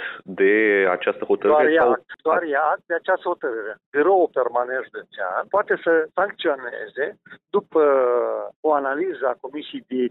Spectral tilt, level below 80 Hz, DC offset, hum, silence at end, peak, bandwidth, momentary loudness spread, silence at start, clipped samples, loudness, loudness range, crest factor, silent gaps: -8 dB/octave; -70 dBFS; under 0.1%; none; 0 s; -6 dBFS; 4.1 kHz; 12 LU; 0 s; under 0.1%; -21 LUFS; 3 LU; 14 dB; 3.86-3.92 s, 8.56-8.63 s